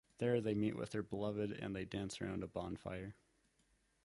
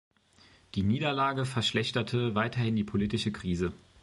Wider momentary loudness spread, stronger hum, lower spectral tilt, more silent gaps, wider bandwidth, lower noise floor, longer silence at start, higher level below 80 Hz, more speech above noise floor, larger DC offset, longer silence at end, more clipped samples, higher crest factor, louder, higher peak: first, 9 LU vs 4 LU; neither; about the same, -6.5 dB/octave vs -6 dB/octave; neither; about the same, 11.5 kHz vs 11.5 kHz; first, -77 dBFS vs -61 dBFS; second, 0.2 s vs 0.75 s; second, -64 dBFS vs -52 dBFS; first, 36 dB vs 31 dB; neither; first, 0.9 s vs 0.25 s; neither; about the same, 18 dB vs 16 dB; second, -42 LUFS vs -30 LUFS; second, -24 dBFS vs -14 dBFS